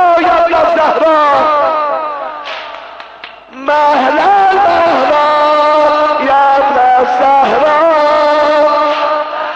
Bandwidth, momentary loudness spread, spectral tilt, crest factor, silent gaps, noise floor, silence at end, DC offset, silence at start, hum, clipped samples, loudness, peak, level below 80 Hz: 8.4 kHz; 13 LU; -4 dB/octave; 8 dB; none; -32 dBFS; 0 s; under 0.1%; 0 s; none; under 0.1%; -9 LUFS; -2 dBFS; -48 dBFS